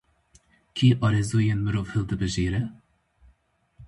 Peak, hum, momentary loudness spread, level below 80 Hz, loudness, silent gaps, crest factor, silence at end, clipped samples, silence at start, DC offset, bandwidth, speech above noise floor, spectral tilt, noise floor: -8 dBFS; none; 9 LU; -44 dBFS; -25 LUFS; none; 18 dB; 0 s; under 0.1%; 0.75 s; under 0.1%; 11.5 kHz; 42 dB; -6.5 dB/octave; -65 dBFS